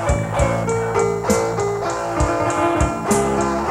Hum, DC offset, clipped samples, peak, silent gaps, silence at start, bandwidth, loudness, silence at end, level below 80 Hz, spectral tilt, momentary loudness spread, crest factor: none; under 0.1%; under 0.1%; -4 dBFS; none; 0 s; 16.5 kHz; -19 LUFS; 0 s; -30 dBFS; -5.5 dB/octave; 3 LU; 16 dB